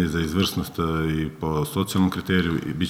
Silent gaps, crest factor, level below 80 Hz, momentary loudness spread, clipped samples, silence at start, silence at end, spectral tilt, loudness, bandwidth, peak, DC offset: none; 16 dB; -42 dBFS; 4 LU; under 0.1%; 0 s; 0 s; -5.5 dB/octave; -24 LUFS; 16.5 kHz; -8 dBFS; under 0.1%